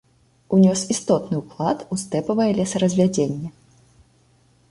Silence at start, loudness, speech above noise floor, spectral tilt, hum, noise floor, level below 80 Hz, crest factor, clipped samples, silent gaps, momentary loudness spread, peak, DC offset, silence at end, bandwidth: 0.5 s; -21 LUFS; 38 dB; -6 dB/octave; none; -58 dBFS; -56 dBFS; 16 dB; under 0.1%; none; 9 LU; -4 dBFS; under 0.1%; 1.2 s; 11.5 kHz